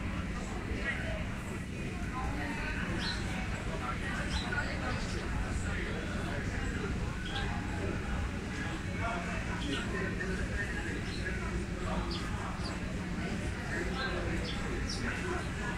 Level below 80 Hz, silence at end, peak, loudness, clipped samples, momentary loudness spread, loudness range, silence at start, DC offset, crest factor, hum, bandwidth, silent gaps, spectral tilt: -40 dBFS; 0 s; -20 dBFS; -36 LUFS; under 0.1%; 3 LU; 1 LU; 0 s; under 0.1%; 14 dB; none; 15 kHz; none; -5 dB/octave